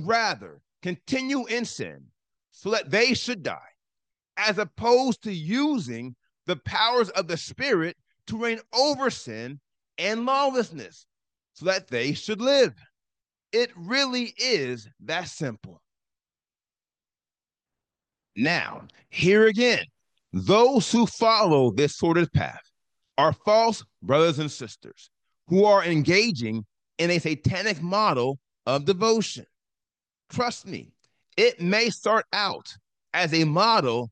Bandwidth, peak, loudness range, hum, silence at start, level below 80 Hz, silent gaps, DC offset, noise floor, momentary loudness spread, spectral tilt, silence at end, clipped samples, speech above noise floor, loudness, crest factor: 9.8 kHz; -6 dBFS; 6 LU; none; 0 s; -64 dBFS; none; under 0.1%; under -90 dBFS; 16 LU; -4.5 dB/octave; 0 s; under 0.1%; over 66 dB; -24 LUFS; 18 dB